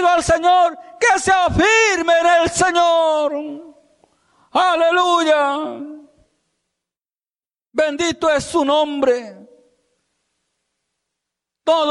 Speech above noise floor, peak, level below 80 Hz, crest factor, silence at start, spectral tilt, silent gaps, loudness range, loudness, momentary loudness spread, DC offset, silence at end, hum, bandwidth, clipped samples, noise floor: over 74 dB; -4 dBFS; -44 dBFS; 14 dB; 0 s; -3 dB/octave; none; 8 LU; -16 LUFS; 12 LU; under 0.1%; 0 s; none; 11.5 kHz; under 0.1%; under -90 dBFS